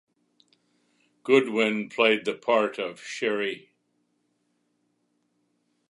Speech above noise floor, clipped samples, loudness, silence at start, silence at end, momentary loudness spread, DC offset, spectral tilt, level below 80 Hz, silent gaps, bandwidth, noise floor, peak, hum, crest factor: 49 dB; under 0.1%; -25 LUFS; 1.25 s; 2.3 s; 12 LU; under 0.1%; -4.5 dB/octave; -82 dBFS; none; 11.5 kHz; -73 dBFS; -6 dBFS; 60 Hz at -70 dBFS; 22 dB